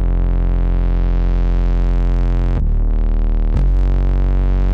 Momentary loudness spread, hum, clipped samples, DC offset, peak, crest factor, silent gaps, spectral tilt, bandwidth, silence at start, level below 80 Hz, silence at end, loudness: 2 LU; none; under 0.1%; under 0.1%; -6 dBFS; 6 dB; none; -9.5 dB/octave; 3.6 kHz; 0 s; -14 dBFS; 0 s; -19 LUFS